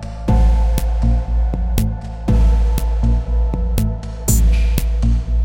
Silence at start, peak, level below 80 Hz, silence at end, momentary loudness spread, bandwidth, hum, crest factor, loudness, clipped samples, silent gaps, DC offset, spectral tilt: 0 s; -2 dBFS; -16 dBFS; 0 s; 5 LU; 17 kHz; none; 12 dB; -18 LUFS; under 0.1%; none; under 0.1%; -6.5 dB/octave